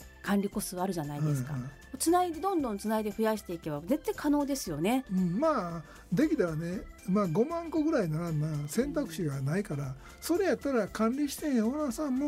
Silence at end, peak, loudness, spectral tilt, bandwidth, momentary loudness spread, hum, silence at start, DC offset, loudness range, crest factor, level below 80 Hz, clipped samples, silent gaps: 0 s; -16 dBFS; -31 LUFS; -6 dB/octave; 16 kHz; 9 LU; none; 0 s; under 0.1%; 1 LU; 16 dB; -54 dBFS; under 0.1%; none